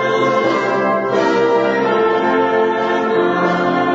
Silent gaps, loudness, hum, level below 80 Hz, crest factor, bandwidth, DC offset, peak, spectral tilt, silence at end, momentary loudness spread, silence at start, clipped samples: none; -15 LUFS; none; -54 dBFS; 12 dB; 7.8 kHz; under 0.1%; -4 dBFS; -6 dB/octave; 0 s; 2 LU; 0 s; under 0.1%